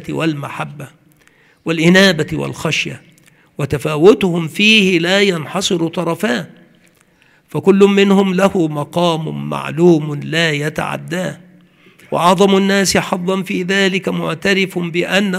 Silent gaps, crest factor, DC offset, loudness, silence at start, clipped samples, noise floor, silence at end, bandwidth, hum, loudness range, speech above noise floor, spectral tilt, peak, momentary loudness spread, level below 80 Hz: none; 16 dB; under 0.1%; -14 LUFS; 0 s; under 0.1%; -52 dBFS; 0 s; 15.5 kHz; none; 3 LU; 38 dB; -5 dB/octave; 0 dBFS; 13 LU; -52 dBFS